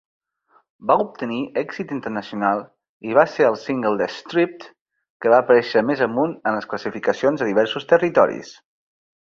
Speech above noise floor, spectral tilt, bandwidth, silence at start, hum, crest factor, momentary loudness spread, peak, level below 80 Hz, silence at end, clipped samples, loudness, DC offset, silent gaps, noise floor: 41 dB; -6 dB/octave; 7.4 kHz; 0.8 s; none; 20 dB; 11 LU; -2 dBFS; -64 dBFS; 0.85 s; under 0.1%; -20 LUFS; under 0.1%; 2.89-3.00 s, 4.81-4.85 s, 5.10-5.20 s; -61 dBFS